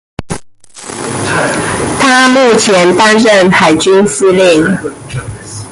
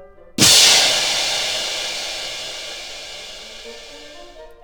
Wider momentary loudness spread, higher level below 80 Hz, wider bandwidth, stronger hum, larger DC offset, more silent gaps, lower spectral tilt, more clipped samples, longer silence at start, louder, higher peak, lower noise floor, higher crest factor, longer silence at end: second, 18 LU vs 25 LU; first, -38 dBFS vs -50 dBFS; second, 11.5 kHz vs 19.5 kHz; neither; second, under 0.1% vs 0.2%; neither; first, -4 dB/octave vs 0 dB/octave; neither; first, 0.2 s vs 0 s; first, -8 LUFS vs -14 LUFS; about the same, 0 dBFS vs 0 dBFS; second, -31 dBFS vs -39 dBFS; second, 10 dB vs 20 dB; about the same, 0 s vs 0.1 s